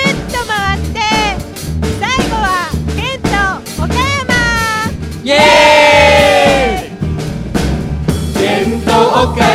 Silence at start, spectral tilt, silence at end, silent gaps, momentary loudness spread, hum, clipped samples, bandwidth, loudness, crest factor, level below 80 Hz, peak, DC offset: 0 s; -4.5 dB/octave; 0 s; none; 13 LU; none; 0.2%; 16.5 kHz; -11 LUFS; 12 dB; -24 dBFS; 0 dBFS; under 0.1%